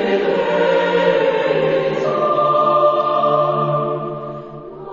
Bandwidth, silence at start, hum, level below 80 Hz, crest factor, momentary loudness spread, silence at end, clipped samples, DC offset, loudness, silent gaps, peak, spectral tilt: 7.4 kHz; 0 s; none; -56 dBFS; 14 dB; 13 LU; 0 s; under 0.1%; under 0.1%; -16 LUFS; none; -2 dBFS; -7 dB/octave